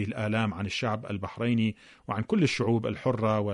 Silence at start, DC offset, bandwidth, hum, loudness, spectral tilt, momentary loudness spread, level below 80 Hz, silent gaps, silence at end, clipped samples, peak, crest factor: 0 s; under 0.1%; 10.5 kHz; none; -29 LUFS; -6.5 dB/octave; 8 LU; -60 dBFS; none; 0 s; under 0.1%; -12 dBFS; 16 dB